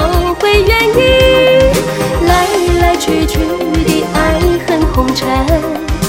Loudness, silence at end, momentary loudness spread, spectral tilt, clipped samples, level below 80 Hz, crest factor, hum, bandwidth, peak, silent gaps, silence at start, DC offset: -11 LUFS; 0 s; 6 LU; -5 dB/octave; under 0.1%; -20 dBFS; 10 dB; none; 17 kHz; 0 dBFS; none; 0 s; 0.2%